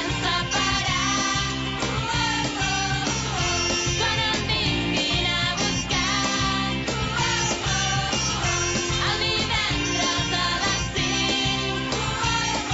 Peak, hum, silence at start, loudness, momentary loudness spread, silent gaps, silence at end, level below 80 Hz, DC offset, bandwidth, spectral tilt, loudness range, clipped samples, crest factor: -12 dBFS; none; 0 s; -22 LUFS; 3 LU; none; 0 s; -38 dBFS; under 0.1%; 8 kHz; -3 dB/octave; 1 LU; under 0.1%; 12 dB